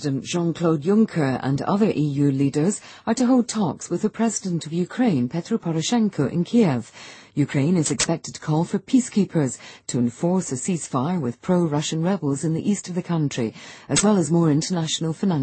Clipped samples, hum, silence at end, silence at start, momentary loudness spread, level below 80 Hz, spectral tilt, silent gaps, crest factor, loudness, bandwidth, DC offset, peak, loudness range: under 0.1%; none; 0 s; 0 s; 7 LU; -58 dBFS; -5.5 dB/octave; none; 16 dB; -22 LUFS; 8.8 kHz; under 0.1%; -4 dBFS; 2 LU